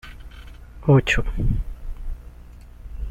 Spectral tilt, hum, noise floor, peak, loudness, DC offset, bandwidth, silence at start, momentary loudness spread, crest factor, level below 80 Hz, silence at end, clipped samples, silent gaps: -6.5 dB/octave; 60 Hz at -40 dBFS; -42 dBFS; -4 dBFS; -21 LUFS; under 0.1%; 9 kHz; 0.05 s; 26 LU; 20 dB; -30 dBFS; 0 s; under 0.1%; none